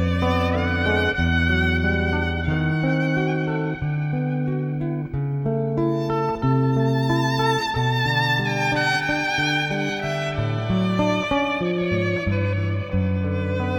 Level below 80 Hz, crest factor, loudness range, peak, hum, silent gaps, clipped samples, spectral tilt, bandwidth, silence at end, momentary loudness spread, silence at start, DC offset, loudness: -42 dBFS; 14 dB; 3 LU; -8 dBFS; none; none; under 0.1%; -6.5 dB/octave; 17.5 kHz; 0 s; 5 LU; 0 s; under 0.1%; -22 LUFS